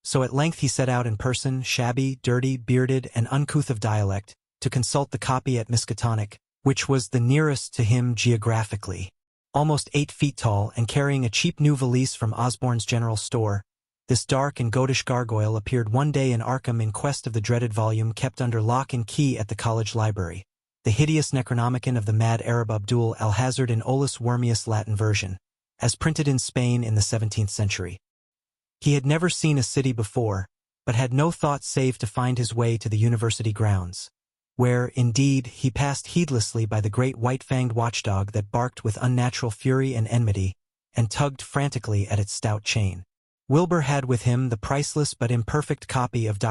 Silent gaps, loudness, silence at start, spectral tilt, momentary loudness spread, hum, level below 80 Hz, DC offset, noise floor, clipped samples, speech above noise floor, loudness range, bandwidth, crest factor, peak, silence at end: 9.27-9.45 s, 28.10-28.32 s, 43.17-43.38 s; -24 LUFS; 0.05 s; -5.5 dB/octave; 5 LU; none; -50 dBFS; under 0.1%; -71 dBFS; under 0.1%; 48 dB; 2 LU; 12 kHz; 16 dB; -6 dBFS; 0 s